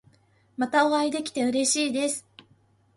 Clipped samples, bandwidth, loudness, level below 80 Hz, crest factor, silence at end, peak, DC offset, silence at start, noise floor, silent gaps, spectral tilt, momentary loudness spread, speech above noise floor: under 0.1%; 11.5 kHz; -25 LUFS; -72 dBFS; 18 dB; 0.75 s; -10 dBFS; under 0.1%; 0.6 s; -62 dBFS; none; -2 dB/octave; 10 LU; 38 dB